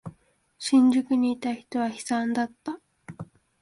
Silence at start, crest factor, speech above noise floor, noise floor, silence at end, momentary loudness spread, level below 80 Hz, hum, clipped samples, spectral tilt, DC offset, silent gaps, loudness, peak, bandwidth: 0.05 s; 16 dB; 37 dB; -61 dBFS; 0.4 s; 23 LU; -66 dBFS; none; under 0.1%; -4.5 dB/octave; under 0.1%; none; -25 LUFS; -10 dBFS; 11.5 kHz